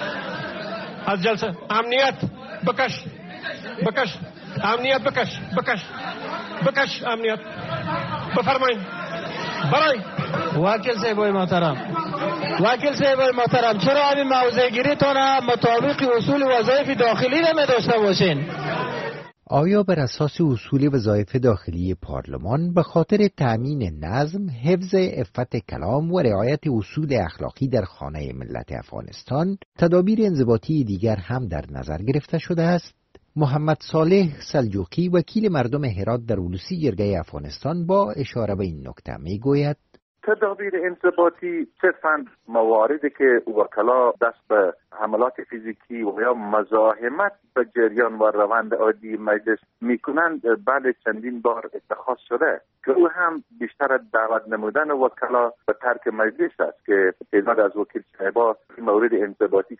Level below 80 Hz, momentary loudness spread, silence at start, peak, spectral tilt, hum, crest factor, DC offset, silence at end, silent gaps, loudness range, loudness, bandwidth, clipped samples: -48 dBFS; 11 LU; 0 s; -4 dBFS; -4.5 dB/octave; none; 16 dB; under 0.1%; 0.05 s; 29.65-29.72 s, 40.02-40.15 s; 5 LU; -22 LUFS; 6.4 kHz; under 0.1%